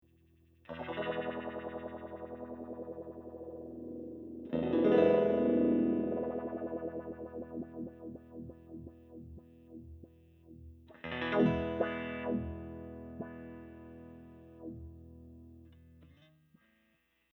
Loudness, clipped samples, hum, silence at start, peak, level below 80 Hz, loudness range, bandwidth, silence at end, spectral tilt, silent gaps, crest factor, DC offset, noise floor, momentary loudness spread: -35 LUFS; under 0.1%; 60 Hz at -75 dBFS; 0.7 s; -14 dBFS; -60 dBFS; 19 LU; 6 kHz; 1.3 s; -9 dB/octave; none; 22 dB; under 0.1%; -75 dBFS; 25 LU